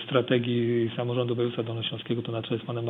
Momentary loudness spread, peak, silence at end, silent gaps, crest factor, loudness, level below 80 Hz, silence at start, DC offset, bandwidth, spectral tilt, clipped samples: 7 LU; -10 dBFS; 0 s; none; 18 dB; -28 LUFS; -70 dBFS; 0 s; under 0.1%; 4 kHz; -9.5 dB/octave; under 0.1%